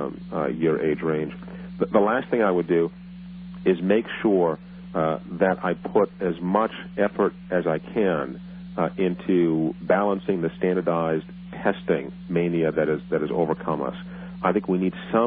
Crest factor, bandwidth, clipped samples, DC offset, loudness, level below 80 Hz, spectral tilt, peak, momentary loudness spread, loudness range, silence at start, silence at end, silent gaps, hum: 18 dB; 4.6 kHz; under 0.1%; under 0.1%; -24 LUFS; -54 dBFS; -6.5 dB/octave; -6 dBFS; 10 LU; 2 LU; 0 s; 0 s; none; none